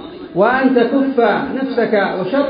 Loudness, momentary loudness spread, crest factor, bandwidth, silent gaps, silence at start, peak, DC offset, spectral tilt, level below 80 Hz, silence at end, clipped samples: -15 LUFS; 5 LU; 14 dB; 5.2 kHz; none; 0 s; -2 dBFS; under 0.1%; -11.5 dB/octave; -52 dBFS; 0 s; under 0.1%